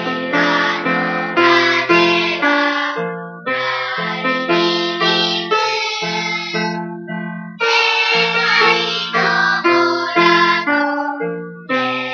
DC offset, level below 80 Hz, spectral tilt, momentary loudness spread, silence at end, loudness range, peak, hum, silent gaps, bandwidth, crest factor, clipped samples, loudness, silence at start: under 0.1%; -72 dBFS; -4 dB/octave; 11 LU; 0 s; 4 LU; 0 dBFS; none; none; 7.2 kHz; 16 dB; under 0.1%; -15 LUFS; 0 s